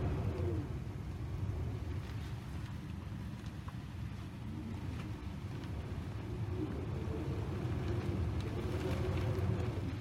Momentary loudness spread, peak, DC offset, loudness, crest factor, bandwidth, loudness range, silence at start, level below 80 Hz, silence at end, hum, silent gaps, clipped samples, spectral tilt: 8 LU; -22 dBFS; under 0.1%; -40 LUFS; 16 dB; 14.5 kHz; 6 LU; 0 s; -46 dBFS; 0 s; none; none; under 0.1%; -7.5 dB/octave